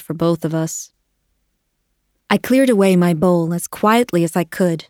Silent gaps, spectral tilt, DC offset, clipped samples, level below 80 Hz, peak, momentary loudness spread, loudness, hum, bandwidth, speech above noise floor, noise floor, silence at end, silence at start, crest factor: none; -6 dB/octave; under 0.1%; under 0.1%; -56 dBFS; 0 dBFS; 9 LU; -16 LUFS; none; 18 kHz; 53 dB; -69 dBFS; 0.05 s; 0 s; 18 dB